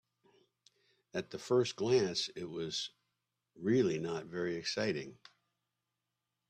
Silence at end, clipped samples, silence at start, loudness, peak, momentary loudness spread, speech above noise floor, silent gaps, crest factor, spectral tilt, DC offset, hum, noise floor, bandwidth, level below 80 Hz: 1.35 s; under 0.1%; 1.15 s; -35 LUFS; -18 dBFS; 11 LU; 53 dB; none; 18 dB; -5 dB/octave; under 0.1%; none; -88 dBFS; 9.6 kHz; -76 dBFS